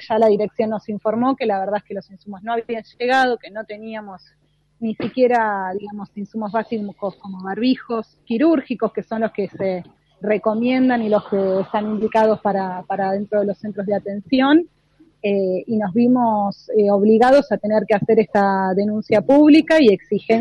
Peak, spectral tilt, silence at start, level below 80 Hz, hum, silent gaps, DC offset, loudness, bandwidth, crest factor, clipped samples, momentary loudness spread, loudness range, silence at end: -2 dBFS; -7.5 dB/octave; 0 s; -60 dBFS; none; none; under 0.1%; -18 LUFS; 10 kHz; 16 dB; under 0.1%; 15 LU; 7 LU; 0 s